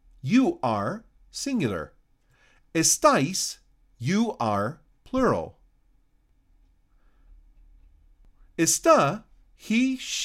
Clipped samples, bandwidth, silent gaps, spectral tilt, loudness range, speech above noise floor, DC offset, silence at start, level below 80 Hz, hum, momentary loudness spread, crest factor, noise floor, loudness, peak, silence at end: under 0.1%; 16 kHz; none; -4 dB/octave; 8 LU; 40 dB; under 0.1%; 0.25 s; -54 dBFS; none; 18 LU; 20 dB; -64 dBFS; -24 LUFS; -6 dBFS; 0 s